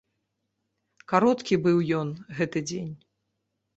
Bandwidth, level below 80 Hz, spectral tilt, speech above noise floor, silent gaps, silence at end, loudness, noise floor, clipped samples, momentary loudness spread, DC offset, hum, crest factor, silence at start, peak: 8.2 kHz; -64 dBFS; -6.5 dB/octave; 54 dB; none; 0.8 s; -26 LUFS; -79 dBFS; under 0.1%; 12 LU; under 0.1%; none; 22 dB; 1.1 s; -6 dBFS